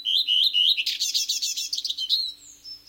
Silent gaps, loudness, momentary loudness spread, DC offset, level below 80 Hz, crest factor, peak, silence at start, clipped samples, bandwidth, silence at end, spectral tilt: none; -21 LUFS; 11 LU; under 0.1%; -72 dBFS; 16 dB; -10 dBFS; 0 s; under 0.1%; 17 kHz; 0.1 s; 5 dB/octave